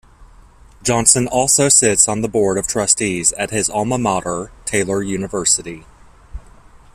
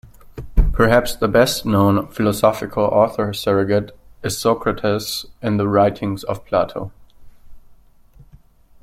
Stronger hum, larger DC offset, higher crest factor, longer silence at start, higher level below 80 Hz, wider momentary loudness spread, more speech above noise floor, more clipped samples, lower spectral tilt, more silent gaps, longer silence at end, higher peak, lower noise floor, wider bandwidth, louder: neither; neither; about the same, 18 dB vs 18 dB; first, 0.2 s vs 0.05 s; second, -42 dBFS vs -28 dBFS; about the same, 11 LU vs 10 LU; about the same, 28 dB vs 30 dB; neither; second, -3 dB/octave vs -5.5 dB/octave; neither; second, 0.55 s vs 1.1 s; about the same, 0 dBFS vs -2 dBFS; second, -44 dBFS vs -48 dBFS; about the same, 16 kHz vs 16.5 kHz; first, -15 LUFS vs -18 LUFS